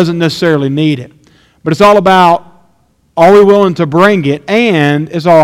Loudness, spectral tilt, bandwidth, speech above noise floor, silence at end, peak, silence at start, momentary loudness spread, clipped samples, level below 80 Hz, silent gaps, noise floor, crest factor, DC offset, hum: -8 LUFS; -6.5 dB/octave; 15.5 kHz; 45 dB; 0 s; 0 dBFS; 0 s; 10 LU; 2%; -46 dBFS; none; -53 dBFS; 8 dB; under 0.1%; none